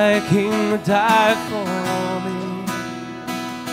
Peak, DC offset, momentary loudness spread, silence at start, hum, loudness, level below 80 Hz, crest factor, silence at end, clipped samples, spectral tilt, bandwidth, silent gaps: -4 dBFS; under 0.1%; 12 LU; 0 s; none; -20 LUFS; -56 dBFS; 16 dB; 0 s; under 0.1%; -5 dB/octave; 16 kHz; none